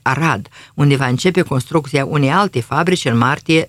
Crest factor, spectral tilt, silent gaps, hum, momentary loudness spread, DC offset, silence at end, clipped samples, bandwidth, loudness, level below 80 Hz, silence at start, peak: 14 dB; -6 dB/octave; none; none; 4 LU; under 0.1%; 0 s; under 0.1%; 14 kHz; -16 LUFS; -50 dBFS; 0.05 s; 0 dBFS